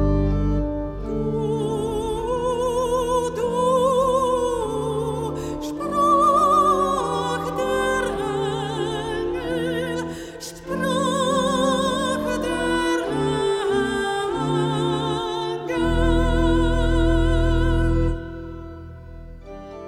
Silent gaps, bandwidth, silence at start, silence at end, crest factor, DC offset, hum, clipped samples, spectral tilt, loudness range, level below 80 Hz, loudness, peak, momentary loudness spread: none; 15 kHz; 0 s; 0 s; 14 dB; under 0.1%; none; under 0.1%; -5.5 dB/octave; 4 LU; -30 dBFS; -22 LUFS; -8 dBFS; 10 LU